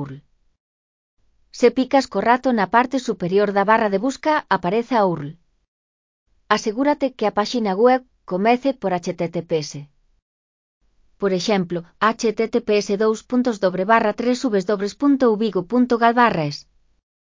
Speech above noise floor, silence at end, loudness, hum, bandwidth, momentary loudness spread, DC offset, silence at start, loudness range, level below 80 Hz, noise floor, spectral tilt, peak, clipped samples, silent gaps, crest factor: 23 dB; 0.75 s; -19 LUFS; none; 7.6 kHz; 8 LU; under 0.1%; 0 s; 5 LU; -58 dBFS; -42 dBFS; -5.5 dB/octave; -2 dBFS; under 0.1%; 0.60-1.17 s, 5.68-6.26 s, 10.22-10.81 s; 20 dB